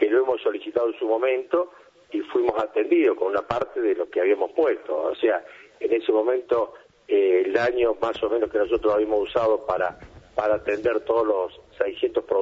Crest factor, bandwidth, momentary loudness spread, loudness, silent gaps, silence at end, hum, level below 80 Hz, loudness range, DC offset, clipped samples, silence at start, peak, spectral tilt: 16 dB; 7.4 kHz; 7 LU; -24 LUFS; none; 0 s; none; -56 dBFS; 1 LU; under 0.1%; under 0.1%; 0 s; -8 dBFS; -6.5 dB/octave